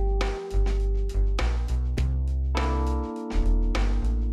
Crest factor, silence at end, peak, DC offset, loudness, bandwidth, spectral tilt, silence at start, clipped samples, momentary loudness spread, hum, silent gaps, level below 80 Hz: 12 dB; 0 s; -12 dBFS; under 0.1%; -28 LUFS; 9 kHz; -6.5 dB/octave; 0 s; under 0.1%; 2 LU; none; none; -24 dBFS